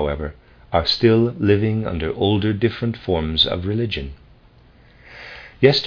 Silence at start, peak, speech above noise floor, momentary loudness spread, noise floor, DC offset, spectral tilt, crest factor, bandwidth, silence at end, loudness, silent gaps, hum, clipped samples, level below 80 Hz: 0 s; 0 dBFS; 31 dB; 18 LU; -50 dBFS; under 0.1%; -7.5 dB/octave; 20 dB; 5.4 kHz; 0 s; -19 LUFS; none; none; under 0.1%; -38 dBFS